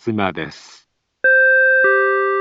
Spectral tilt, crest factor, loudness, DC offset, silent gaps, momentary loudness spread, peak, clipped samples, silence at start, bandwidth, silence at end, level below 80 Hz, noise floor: -6 dB/octave; 12 dB; -14 LUFS; under 0.1%; none; 14 LU; -4 dBFS; under 0.1%; 0.05 s; 7.8 kHz; 0 s; -60 dBFS; -54 dBFS